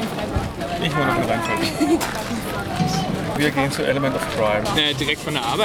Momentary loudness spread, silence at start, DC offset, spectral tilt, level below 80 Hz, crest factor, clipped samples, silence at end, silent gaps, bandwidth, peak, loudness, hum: 7 LU; 0 s; under 0.1%; -4.5 dB/octave; -40 dBFS; 16 dB; under 0.1%; 0 s; none; 18.5 kHz; -6 dBFS; -21 LUFS; none